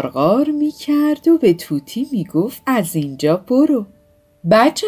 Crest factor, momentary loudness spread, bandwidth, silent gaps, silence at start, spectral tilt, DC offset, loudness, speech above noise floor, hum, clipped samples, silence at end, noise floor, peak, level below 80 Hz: 14 dB; 9 LU; 16 kHz; none; 0 s; -6 dB/octave; under 0.1%; -17 LUFS; 38 dB; none; under 0.1%; 0 s; -53 dBFS; -2 dBFS; -56 dBFS